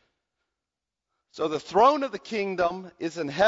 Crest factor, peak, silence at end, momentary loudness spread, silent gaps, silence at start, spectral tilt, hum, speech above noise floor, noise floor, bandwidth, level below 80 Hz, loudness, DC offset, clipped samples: 20 dB; -6 dBFS; 0 s; 12 LU; none; 1.35 s; -5 dB/octave; none; 63 dB; -88 dBFS; 7.8 kHz; -66 dBFS; -26 LUFS; under 0.1%; under 0.1%